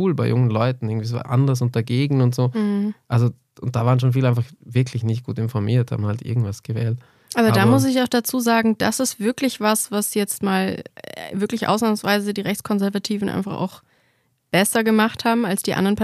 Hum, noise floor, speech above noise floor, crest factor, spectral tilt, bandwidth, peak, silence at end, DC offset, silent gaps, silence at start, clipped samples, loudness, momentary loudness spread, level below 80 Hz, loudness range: none; -65 dBFS; 45 dB; 16 dB; -5.5 dB/octave; 15 kHz; -4 dBFS; 0 s; under 0.1%; none; 0 s; under 0.1%; -21 LUFS; 8 LU; -58 dBFS; 4 LU